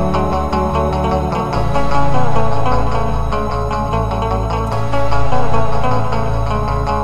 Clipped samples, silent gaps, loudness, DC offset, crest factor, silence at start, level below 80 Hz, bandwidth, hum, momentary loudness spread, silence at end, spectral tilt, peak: under 0.1%; none; -18 LUFS; under 0.1%; 12 dB; 0 s; -24 dBFS; 12.5 kHz; none; 2 LU; 0 s; -7 dB/octave; 0 dBFS